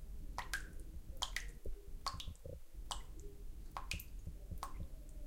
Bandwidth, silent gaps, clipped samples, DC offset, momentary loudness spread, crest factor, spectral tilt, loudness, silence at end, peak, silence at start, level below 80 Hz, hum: 16.5 kHz; none; under 0.1%; under 0.1%; 11 LU; 26 dB; -2.5 dB/octave; -48 LUFS; 0 s; -20 dBFS; 0 s; -48 dBFS; none